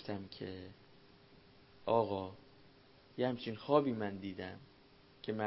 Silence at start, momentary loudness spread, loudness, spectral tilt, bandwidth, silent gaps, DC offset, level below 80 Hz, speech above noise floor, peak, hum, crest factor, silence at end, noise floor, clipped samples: 0 s; 19 LU; -38 LUFS; -5 dB/octave; 5.6 kHz; none; under 0.1%; -68 dBFS; 26 dB; -16 dBFS; none; 24 dB; 0 s; -64 dBFS; under 0.1%